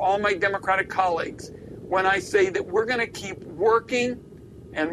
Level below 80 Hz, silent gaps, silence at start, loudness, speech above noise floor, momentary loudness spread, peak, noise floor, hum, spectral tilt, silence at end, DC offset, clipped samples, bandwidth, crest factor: -54 dBFS; none; 0 s; -24 LUFS; 20 dB; 14 LU; -8 dBFS; -43 dBFS; none; -4.5 dB/octave; 0 s; under 0.1%; under 0.1%; 13 kHz; 16 dB